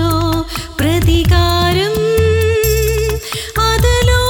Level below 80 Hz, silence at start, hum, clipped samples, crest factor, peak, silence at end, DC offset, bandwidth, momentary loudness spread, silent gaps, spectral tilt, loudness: -20 dBFS; 0 s; none; under 0.1%; 10 dB; -2 dBFS; 0 s; under 0.1%; over 20 kHz; 7 LU; none; -5 dB/octave; -14 LUFS